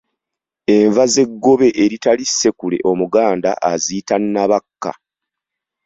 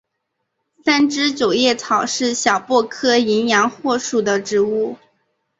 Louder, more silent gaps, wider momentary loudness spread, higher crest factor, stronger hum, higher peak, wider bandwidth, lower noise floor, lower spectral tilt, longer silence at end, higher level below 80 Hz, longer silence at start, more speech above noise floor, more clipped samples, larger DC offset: about the same, -15 LUFS vs -17 LUFS; neither; first, 7 LU vs 4 LU; about the same, 14 dB vs 16 dB; neither; about the same, -2 dBFS vs -2 dBFS; about the same, 7.8 kHz vs 8 kHz; first, -84 dBFS vs -75 dBFS; about the same, -4 dB/octave vs -3 dB/octave; first, 0.95 s vs 0.65 s; first, -56 dBFS vs -62 dBFS; second, 0.7 s vs 0.85 s; first, 69 dB vs 58 dB; neither; neither